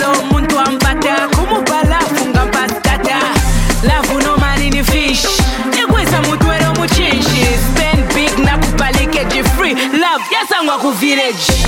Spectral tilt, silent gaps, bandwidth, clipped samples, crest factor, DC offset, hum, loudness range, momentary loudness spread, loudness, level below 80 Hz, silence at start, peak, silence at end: -4 dB/octave; none; 17 kHz; under 0.1%; 12 dB; under 0.1%; none; 1 LU; 2 LU; -12 LUFS; -18 dBFS; 0 s; -2 dBFS; 0 s